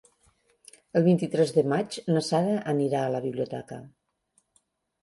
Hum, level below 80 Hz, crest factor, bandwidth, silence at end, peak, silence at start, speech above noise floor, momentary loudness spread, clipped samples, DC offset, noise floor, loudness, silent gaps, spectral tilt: none; -70 dBFS; 18 dB; 11.5 kHz; 1.15 s; -10 dBFS; 0.95 s; 46 dB; 11 LU; under 0.1%; under 0.1%; -71 dBFS; -26 LUFS; none; -6.5 dB/octave